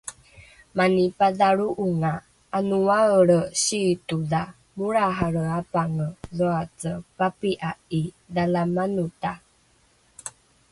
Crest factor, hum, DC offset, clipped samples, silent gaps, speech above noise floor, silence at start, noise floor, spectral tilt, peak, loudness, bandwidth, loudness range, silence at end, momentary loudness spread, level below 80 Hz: 18 dB; none; under 0.1%; under 0.1%; none; 38 dB; 0.05 s; -61 dBFS; -5.5 dB/octave; -6 dBFS; -24 LUFS; 11.5 kHz; 6 LU; 0.4 s; 13 LU; -54 dBFS